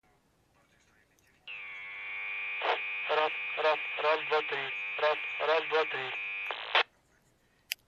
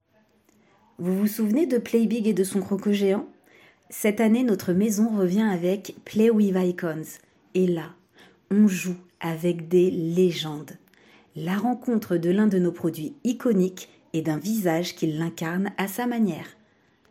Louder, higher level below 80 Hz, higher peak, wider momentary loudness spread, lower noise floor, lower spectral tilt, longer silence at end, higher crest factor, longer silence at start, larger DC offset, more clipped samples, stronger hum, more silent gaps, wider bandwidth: second, -31 LUFS vs -24 LUFS; second, -78 dBFS vs -68 dBFS; about the same, -10 dBFS vs -10 dBFS; about the same, 12 LU vs 11 LU; first, -69 dBFS vs -63 dBFS; second, -1.5 dB/octave vs -6.5 dB/octave; second, 0.15 s vs 0.6 s; first, 24 dB vs 16 dB; first, 1.45 s vs 1 s; neither; neither; neither; neither; second, 13.5 kHz vs 16.5 kHz